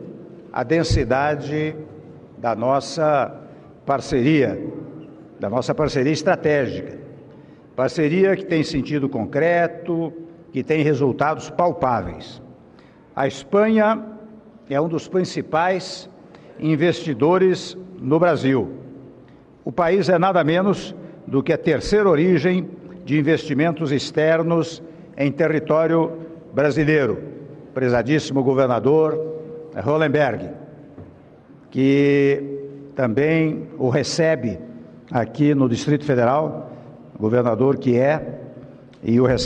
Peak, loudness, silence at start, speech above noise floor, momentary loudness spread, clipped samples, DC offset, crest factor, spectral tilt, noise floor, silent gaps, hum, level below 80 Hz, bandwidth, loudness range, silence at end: -6 dBFS; -20 LUFS; 0 s; 29 dB; 17 LU; under 0.1%; under 0.1%; 14 dB; -6.5 dB/octave; -48 dBFS; none; none; -46 dBFS; 10 kHz; 3 LU; 0 s